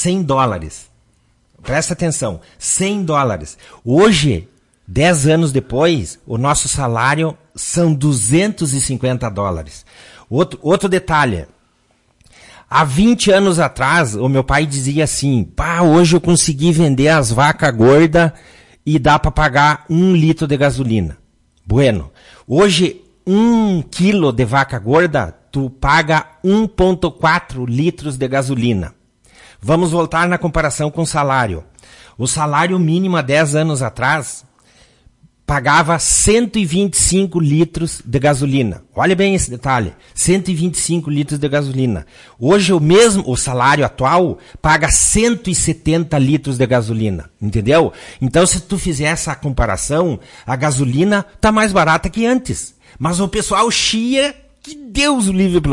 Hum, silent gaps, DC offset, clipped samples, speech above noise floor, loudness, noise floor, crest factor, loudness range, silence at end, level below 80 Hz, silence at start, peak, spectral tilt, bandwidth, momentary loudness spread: none; none; under 0.1%; under 0.1%; 44 dB; -14 LUFS; -58 dBFS; 14 dB; 4 LU; 0 s; -34 dBFS; 0 s; 0 dBFS; -4.5 dB/octave; 11.5 kHz; 10 LU